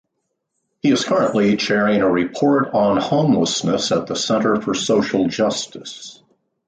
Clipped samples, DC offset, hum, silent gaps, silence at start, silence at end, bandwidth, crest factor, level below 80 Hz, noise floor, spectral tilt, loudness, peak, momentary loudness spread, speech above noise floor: under 0.1%; under 0.1%; none; none; 0.85 s; 0.55 s; 9.4 kHz; 14 dB; -56 dBFS; -74 dBFS; -4.5 dB/octave; -18 LUFS; -4 dBFS; 8 LU; 57 dB